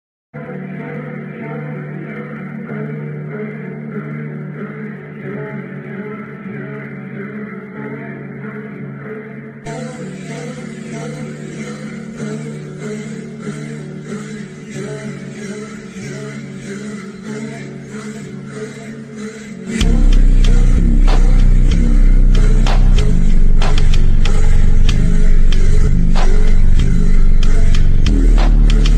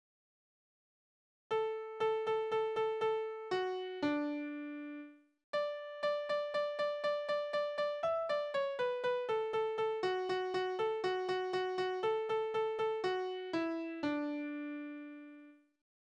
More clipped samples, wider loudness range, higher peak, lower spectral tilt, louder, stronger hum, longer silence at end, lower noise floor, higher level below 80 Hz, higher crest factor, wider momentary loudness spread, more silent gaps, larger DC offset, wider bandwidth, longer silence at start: neither; first, 12 LU vs 3 LU; first, 0 dBFS vs -24 dBFS; first, -6.5 dB/octave vs -5 dB/octave; first, -20 LUFS vs -37 LUFS; neither; second, 0 s vs 0.45 s; second, -30 dBFS vs -58 dBFS; first, -12 dBFS vs -80 dBFS; about the same, 12 dB vs 14 dB; first, 13 LU vs 8 LU; second, none vs 5.44-5.53 s; neither; about the same, 8.8 kHz vs 9.2 kHz; second, 0.35 s vs 1.5 s